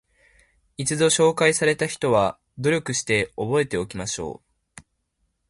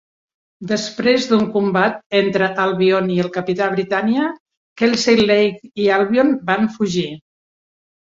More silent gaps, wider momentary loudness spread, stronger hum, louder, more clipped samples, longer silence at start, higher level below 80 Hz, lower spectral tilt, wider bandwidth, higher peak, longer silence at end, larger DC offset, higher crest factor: second, none vs 2.06-2.10 s, 4.40-4.46 s, 4.57-4.76 s; first, 11 LU vs 7 LU; neither; second, -22 LUFS vs -17 LUFS; neither; first, 0.8 s vs 0.6 s; about the same, -54 dBFS vs -58 dBFS; second, -3.5 dB/octave vs -5 dB/octave; first, 11.5 kHz vs 7.8 kHz; about the same, -2 dBFS vs -2 dBFS; first, 1.15 s vs 0.95 s; neither; first, 22 dB vs 16 dB